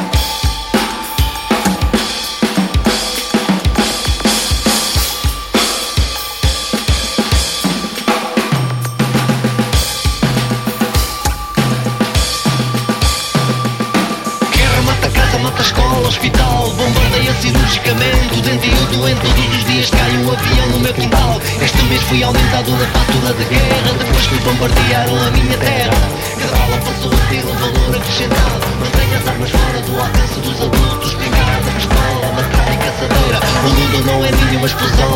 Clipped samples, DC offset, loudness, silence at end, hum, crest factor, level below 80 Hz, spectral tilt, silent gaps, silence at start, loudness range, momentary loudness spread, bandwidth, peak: under 0.1%; 0.2%; -14 LUFS; 0 s; none; 12 dB; -20 dBFS; -4.5 dB/octave; none; 0 s; 3 LU; 4 LU; 17 kHz; 0 dBFS